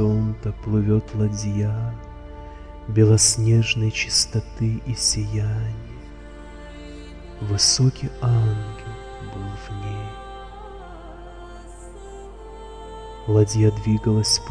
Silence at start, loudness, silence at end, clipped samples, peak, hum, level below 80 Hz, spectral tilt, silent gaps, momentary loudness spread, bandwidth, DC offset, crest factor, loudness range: 0 s; -21 LUFS; 0 s; under 0.1%; -4 dBFS; none; -38 dBFS; -4.5 dB/octave; none; 23 LU; 10 kHz; under 0.1%; 20 dB; 16 LU